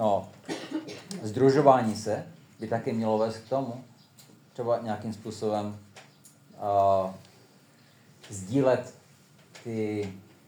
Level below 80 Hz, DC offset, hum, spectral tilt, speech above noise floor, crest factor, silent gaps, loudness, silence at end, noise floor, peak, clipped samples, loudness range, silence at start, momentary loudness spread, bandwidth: -82 dBFS; under 0.1%; none; -6.5 dB/octave; 31 dB; 24 dB; none; -28 LUFS; 0.3 s; -58 dBFS; -6 dBFS; under 0.1%; 6 LU; 0 s; 19 LU; over 20 kHz